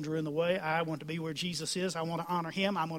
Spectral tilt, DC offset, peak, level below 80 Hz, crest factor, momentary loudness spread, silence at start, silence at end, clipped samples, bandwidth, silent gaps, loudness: -4.5 dB/octave; under 0.1%; -16 dBFS; -72 dBFS; 16 dB; 5 LU; 0 s; 0 s; under 0.1%; 16 kHz; none; -33 LUFS